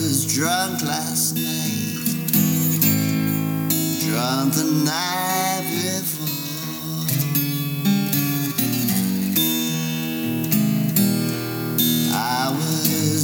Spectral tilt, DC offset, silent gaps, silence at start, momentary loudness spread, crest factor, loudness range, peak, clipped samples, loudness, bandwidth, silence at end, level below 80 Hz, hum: -4 dB/octave; under 0.1%; none; 0 s; 6 LU; 18 dB; 2 LU; -4 dBFS; under 0.1%; -20 LUFS; over 20 kHz; 0 s; -62 dBFS; none